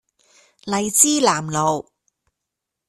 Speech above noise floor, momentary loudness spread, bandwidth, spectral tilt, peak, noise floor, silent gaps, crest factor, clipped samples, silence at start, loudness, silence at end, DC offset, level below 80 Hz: 64 dB; 13 LU; 15 kHz; -2.5 dB/octave; 0 dBFS; -82 dBFS; none; 22 dB; under 0.1%; 0.65 s; -18 LUFS; 1.05 s; under 0.1%; -60 dBFS